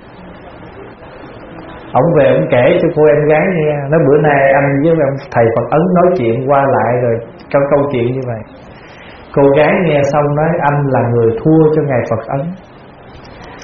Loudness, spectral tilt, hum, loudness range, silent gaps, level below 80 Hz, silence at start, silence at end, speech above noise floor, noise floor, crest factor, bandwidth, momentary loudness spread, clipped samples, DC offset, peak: -12 LUFS; -7 dB/octave; none; 3 LU; none; -42 dBFS; 0.05 s; 0 s; 25 dB; -36 dBFS; 12 dB; 6.2 kHz; 22 LU; under 0.1%; under 0.1%; 0 dBFS